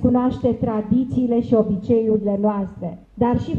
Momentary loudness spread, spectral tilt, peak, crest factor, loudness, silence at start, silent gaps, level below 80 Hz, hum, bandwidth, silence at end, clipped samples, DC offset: 8 LU; -10.5 dB/octave; -4 dBFS; 16 dB; -20 LUFS; 0 s; none; -42 dBFS; none; 4.9 kHz; 0 s; under 0.1%; under 0.1%